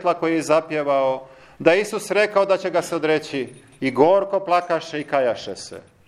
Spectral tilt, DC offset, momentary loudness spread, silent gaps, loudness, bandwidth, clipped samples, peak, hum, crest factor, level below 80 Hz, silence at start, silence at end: -4.5 dB/octave; under 0.1%; 12 LU; none; -20 LUFS; 13.5 kHz; under 0.1%; 0 dBFS; none; 20 dB; -64 dBFS; 0 s; 0.3 s